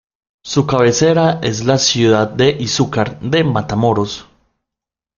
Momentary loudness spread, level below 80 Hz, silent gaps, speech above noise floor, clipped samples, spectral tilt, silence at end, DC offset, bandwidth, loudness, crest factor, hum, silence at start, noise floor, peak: 7 LU; -46 dBFS; none; 71 dB; under 0.1%; -5 dB/octave; 0.95 s; under 0.1%; 7.4 kHz; -14 LUFS; 16 dB; none; 0.45 s; -85 dBFS; 0 dBFS